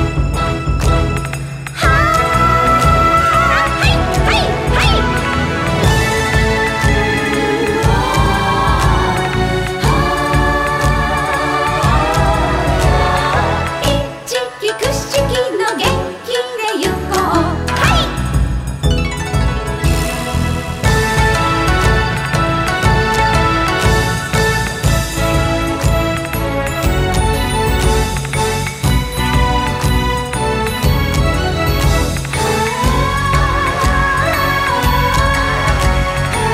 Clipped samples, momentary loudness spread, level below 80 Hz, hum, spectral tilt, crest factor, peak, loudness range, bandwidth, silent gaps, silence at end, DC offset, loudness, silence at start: under 0.1%; 5 LU; -20 dBFS; none; -5 dB/octave; 14 dB; 0 dBFS; 4 LU; 16 kHz; none; 0 s; under 0.1%; -14 LUFS; 0 s